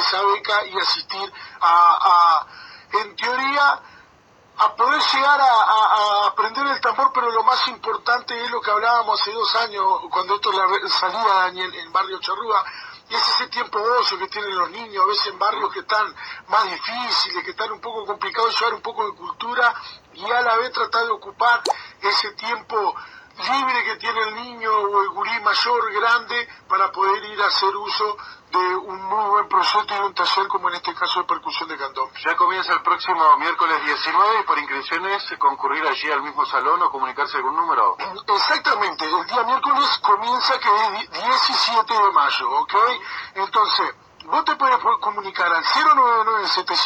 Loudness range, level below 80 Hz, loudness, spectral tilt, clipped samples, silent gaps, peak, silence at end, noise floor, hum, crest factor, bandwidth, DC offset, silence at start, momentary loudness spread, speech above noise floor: 4 LU; -68 dBFS; -19 LUFS; -1.5 dB/octave; under 0.1%; none; -4 dBFS; 0 s; -53 dBFS; none; 16 dB; 9.6 kHz; under 0.1%; 0 s; 9 LU; 33 dB